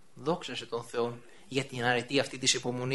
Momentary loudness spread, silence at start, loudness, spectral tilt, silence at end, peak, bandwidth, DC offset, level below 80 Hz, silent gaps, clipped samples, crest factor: 9 LU; 0.15 s; -31 LUFS; -3 dB/octave; 0 s; -12 dBFS; 11.5 kHz; 0.2%; -66 dBFS; none; under 0.1%; 22 dB